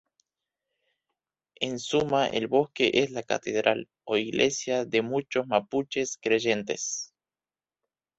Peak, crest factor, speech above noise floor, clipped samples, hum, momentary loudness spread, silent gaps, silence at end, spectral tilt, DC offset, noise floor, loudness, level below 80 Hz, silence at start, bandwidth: -6 dBFS; 24 dB; over 63 dB; under 0.1%; none; 7 LU; none; 1.1 s; -3.5 dB/octave; under 0.1%; under -90 dBFS; -27 LUFS; -66 dBFS; 1.6 s; 8.2 kHz